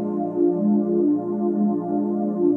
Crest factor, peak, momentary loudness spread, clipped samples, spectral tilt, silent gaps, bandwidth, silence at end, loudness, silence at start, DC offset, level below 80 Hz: 12 dB; -8 dBFS; 4 LU; under 0.1%; -13.5 dB/octave; none; 1.9 kHz; 0 s; -22 LUFS; 0 s; under 0.1%; -80 dBFS